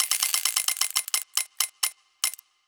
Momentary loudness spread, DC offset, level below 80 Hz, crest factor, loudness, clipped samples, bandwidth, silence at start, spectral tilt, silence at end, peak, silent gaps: 7 LU; under 0.1%; -80 dBFS; 24 dB; -25 LUFS; under 0.1%; over 20 kHz; 0 s; 6 dB/octave; 0.3 s; -4 dBFS; none